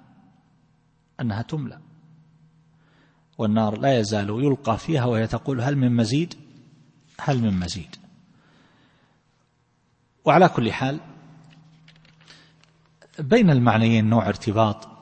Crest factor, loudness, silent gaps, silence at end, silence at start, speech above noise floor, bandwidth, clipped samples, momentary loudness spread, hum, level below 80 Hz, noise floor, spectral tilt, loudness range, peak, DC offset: 22 dB; -22 LUFS; none; 0.1 s; 1.2 s; 45 dB; 8.8 kHz; under 0.1%; 15 LU; none; -54 dBFS; -66 dBFS; -7 dB/octave; 8 LU; -2 dBFS; under 0.1%